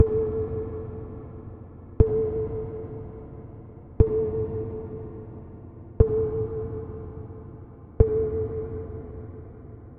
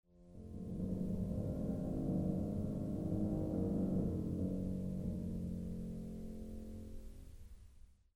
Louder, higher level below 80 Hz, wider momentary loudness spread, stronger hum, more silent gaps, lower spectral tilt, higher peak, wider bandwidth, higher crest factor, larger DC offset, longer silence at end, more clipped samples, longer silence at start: first, -28 LUFS vs -41 LUFS; first, -34 dBFS vs -50 dBFS; first, 21 LU vs 17 LU; neither; neither; first, -12.5 dB/octave vs -10 dB/octave; first, -2 dBFS vs -24 dBFS; second, 2.8 kHz vs 13 kHz; first, 24 dB vs 16 dB; neither; second, 0 s vs 0.2 s; neither; second, 0 s vs 0.15 s